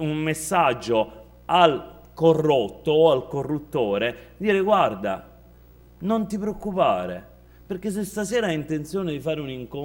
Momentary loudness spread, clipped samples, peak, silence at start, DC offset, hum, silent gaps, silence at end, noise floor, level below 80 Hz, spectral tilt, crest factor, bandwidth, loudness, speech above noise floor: 13 LU; under 0.1%; -4 dBFS; 0 s; under 0.1%; none; none; 0 s; -50 dBFS; -52 dBFS; -5.5 dB/octave; 20 dB; 16.5 kHz; -23 LUFS; 27 dB